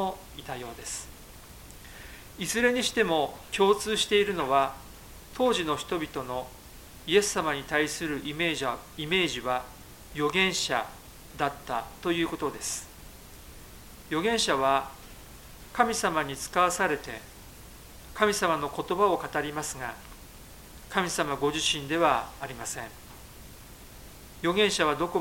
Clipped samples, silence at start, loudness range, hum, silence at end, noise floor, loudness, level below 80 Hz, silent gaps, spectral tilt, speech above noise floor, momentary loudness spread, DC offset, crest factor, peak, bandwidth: under 0.1%; 0 s; 4 LU; none; 0 s; -48 dBFS; -28 LUFS; -52 dBFS; none; -3 dB/octave; 20 dB; 23 LU; under 0.1%; 24 dB; -6 dBFS; 17 kHz